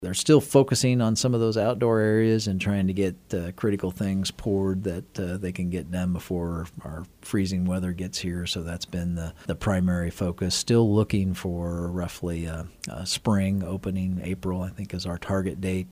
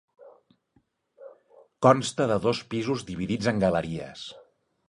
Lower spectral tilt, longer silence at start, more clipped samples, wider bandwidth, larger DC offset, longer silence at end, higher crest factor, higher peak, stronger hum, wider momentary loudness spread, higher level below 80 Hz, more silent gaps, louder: about the same, -5.5 dB/octave vs -5.5 dB/octave; second, 0 s vs 0.2 s; neither; first, 15.5 kHz vs 11.5 kHz; neither; second, 0 s vs 0.5 s; about the same, 20 dB vs 24 dB; about the same, -6 dBFS vs -4 dBFS; neither; second, 11 LU vs 15 LU; first, -46 dBFS vs -56 dBFS; neither; about the same, -26 LUFS vs -26 LUFS